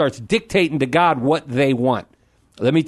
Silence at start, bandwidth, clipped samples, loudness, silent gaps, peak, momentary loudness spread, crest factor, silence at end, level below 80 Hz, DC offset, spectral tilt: 0 s; 12.5 kHz; under 0.1%; -19 LUFS; none; -2 dBFS; 6 LU; 16 dB; 0 s; -52 dBFS; under 0.1%; -6.5 dB/octave